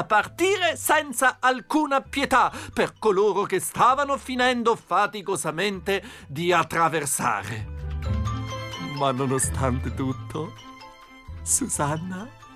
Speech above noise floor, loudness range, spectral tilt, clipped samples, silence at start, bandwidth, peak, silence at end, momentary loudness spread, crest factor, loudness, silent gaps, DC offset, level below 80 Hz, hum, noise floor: 22 dB; 5 LU; -4 dB/octave; under 0.1%; 0 s; 16 kHz; -10 dBFS; 0 s; 13 LU; 16 dB; -24 LUFS; none; under 0.1%; -44 dBFS; none; -46 dBFS